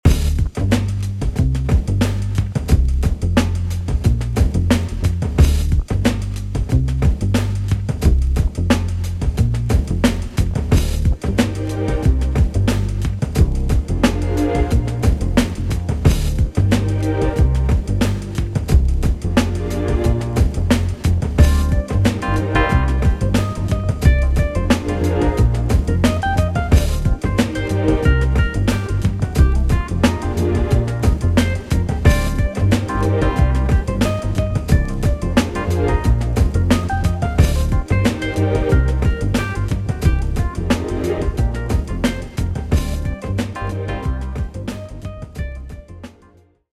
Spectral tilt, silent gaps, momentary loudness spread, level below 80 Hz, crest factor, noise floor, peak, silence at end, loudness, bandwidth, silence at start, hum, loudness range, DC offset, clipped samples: -6.5 dB/octave; none; 6 LU; -20 dBFS; 16 dB; -50 dBFS; 0 dBFS; 0.7 s; -18 LUFS; 14.5 kHz; 0.05 s; none; 3 LU; under 0.1%; under 0.1%